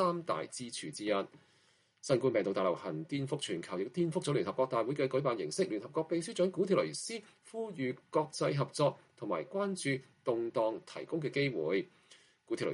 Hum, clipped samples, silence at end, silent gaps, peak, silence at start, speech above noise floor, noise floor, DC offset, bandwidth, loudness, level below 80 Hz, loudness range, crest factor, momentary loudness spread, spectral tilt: none; under 0.1%; 0 s; none; -16 dBFS; 0 s; 36 dB; -70 dBFS; under 0.1%; 11.5 kHz; -35 LUFS; -78 dBFS; 2 LU; 20 dB; 9 LU; -5.5 dB/octave